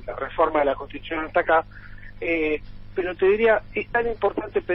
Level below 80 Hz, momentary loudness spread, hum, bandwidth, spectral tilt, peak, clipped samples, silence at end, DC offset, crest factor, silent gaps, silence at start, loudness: -44 dBFS; 11 LU; 50 Hz at -45 dBFS; 5.8 kHz; -9 dB/octave; -8 dBFS; under 0.1%; 0 s; under 0.1%; 16 dB; none; 0 s; -23 LUFS